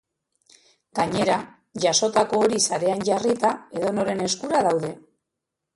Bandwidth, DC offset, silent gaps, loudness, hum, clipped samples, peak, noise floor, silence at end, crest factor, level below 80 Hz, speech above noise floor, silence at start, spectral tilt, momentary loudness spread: 11.5 kHz; under 0.1%; none; -22 LUFS; none; under 0.1%; -6 dBFS; -83 dBFS; 0.75 s; 18 dB; -62 dBFS; 61 dB; 0.95 s; -3.5 dB/octave; 7 LU